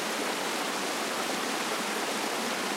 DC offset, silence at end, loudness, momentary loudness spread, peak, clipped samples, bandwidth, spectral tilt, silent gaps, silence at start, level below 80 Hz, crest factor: under 0.1%; 0 s; -30 LUFS; 0 LU; -18 dBFS; under 0.1%; 16 kHz; -1.5 dB/octave; none; 0 s; -84 dBFS; 14 dB